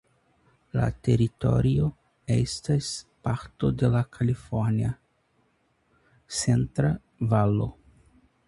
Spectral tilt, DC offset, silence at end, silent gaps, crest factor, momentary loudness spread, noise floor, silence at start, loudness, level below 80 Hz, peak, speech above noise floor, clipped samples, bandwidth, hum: -6.5 dB/octave; under 0.1%; 0.75 s; none; 18 dB; 9 LU; -69 dBFS; 0.75 s; -26 LUFS; -46 dBFS; -8 dBFS; 44 dB; under 0.1%; 11.5 kHz; none